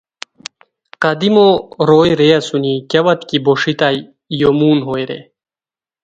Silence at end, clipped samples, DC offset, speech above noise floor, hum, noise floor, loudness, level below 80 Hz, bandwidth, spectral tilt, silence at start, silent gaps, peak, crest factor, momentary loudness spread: 0.8 s; under 0.1%; under 0.1%; over 77 dB; none; under -90 dBFS; -13 LUFS; -52 dBFS; 9 kHz; -6 dB/octave; 1 s; none; 0 dBFS; 14 dB; 19 LU